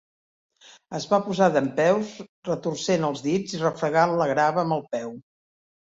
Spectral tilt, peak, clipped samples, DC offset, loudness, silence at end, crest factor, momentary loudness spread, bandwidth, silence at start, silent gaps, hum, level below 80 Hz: -5.5 dB/octave; -6 dBFS; under 0.1%; under 0.1%; -24 LUFS; 0.65 s; 18 dB; 12 LU; 7.8 kHz; 0.9 s; 2.29-2.43 s; none; -66 dBFS